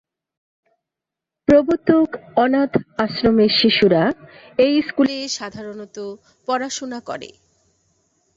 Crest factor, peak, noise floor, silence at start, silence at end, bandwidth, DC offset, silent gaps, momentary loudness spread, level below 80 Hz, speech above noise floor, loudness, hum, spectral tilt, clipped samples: 18 dB; -2 dBFS; -85 dBFS; 1.5 s; 1.1 s; 7.8 kHz; under 0.1%; none; 18 LU; -50 dBFS; 67 dB; -18 LUFS; none; -5 dB/octave; under 0.1%